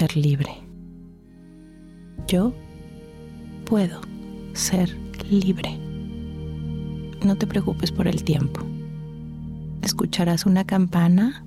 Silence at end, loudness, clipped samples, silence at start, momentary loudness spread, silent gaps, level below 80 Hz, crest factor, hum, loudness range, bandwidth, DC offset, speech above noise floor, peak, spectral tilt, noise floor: 0 s; -23 LUFS; under 0.1%; 0 s; 20 LU; none; -44 dBFS; 14 dB; none; 5 LU; 15 kHz; under 0.1%; 25 dB; -10 dBFS; -6 dB/octave; -46 dBFS